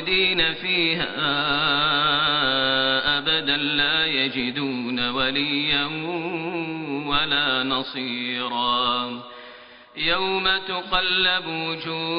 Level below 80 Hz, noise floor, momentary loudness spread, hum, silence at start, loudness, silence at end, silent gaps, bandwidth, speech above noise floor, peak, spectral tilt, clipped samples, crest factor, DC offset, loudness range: -50 dBFS; -45 dBFS; 9 LU; none; 0 s; -21 LUFS; 0 s; none; 5.4 kHz; 22 dB; -6 dBFS; -0.5 dB/octave; under 0.1%; 18 dB; under 0.1%; 4 LU